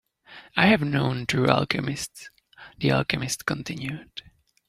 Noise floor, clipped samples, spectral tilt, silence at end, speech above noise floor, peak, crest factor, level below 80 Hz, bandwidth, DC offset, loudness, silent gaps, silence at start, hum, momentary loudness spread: -50 dBFS; under 0.1%; -5 dB/octave; 0.5 s; 25 dB; -2 dBFS; 24 dB; -54 dBFS; 15.5 kHz; under 0.1%; -24 LUFS; none; 0.3 s; none; 17 LU